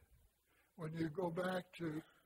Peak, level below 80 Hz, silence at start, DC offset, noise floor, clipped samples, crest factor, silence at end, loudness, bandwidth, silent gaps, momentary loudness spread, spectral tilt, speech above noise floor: -30 dBFS; -74 dBFS; 0.1 s; under 0.1%; -77 dBFS; under 0.1%; 16 dB; 0.2 s; -44 LUFS; 16 kHz; none; 7 LU; -7 dB/octave; 34 dB